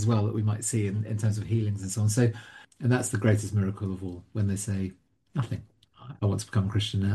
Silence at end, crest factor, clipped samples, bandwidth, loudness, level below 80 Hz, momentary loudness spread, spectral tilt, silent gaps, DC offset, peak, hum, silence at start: 0 s; 18 dB; under 0.1%; 12.5 kHz; -29 LUFS; -58 dBFS; 11 LU; -6 dB/octave; none; under 0.1%; -10 dBFS; none; 0 s